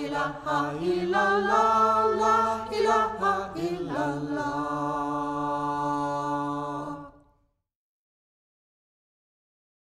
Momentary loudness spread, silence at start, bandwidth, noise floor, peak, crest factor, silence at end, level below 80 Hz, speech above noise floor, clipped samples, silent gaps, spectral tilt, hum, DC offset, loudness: 9 LU; 0 s; 14.5 kHz; -70 dBFS; -10 dBFS; 18 dB; 2.75 s; -58 dBFS; 45 dB; under 0.1%; none; -5.5 dB/octave; none; under 0.1%; -26 LUFS